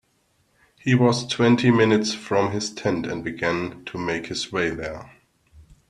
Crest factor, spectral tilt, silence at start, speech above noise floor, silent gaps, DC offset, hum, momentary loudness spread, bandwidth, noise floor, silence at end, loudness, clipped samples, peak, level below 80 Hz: 20 dB; -5.5 dB/octave; 0.85 s; 44 dB; none; under 0.1%; none; 13 LU; 11 kHz; -66 dBFS; 0.3 s; -22 LUFS; under 0.1%; -4 dBFS; -54 dBFS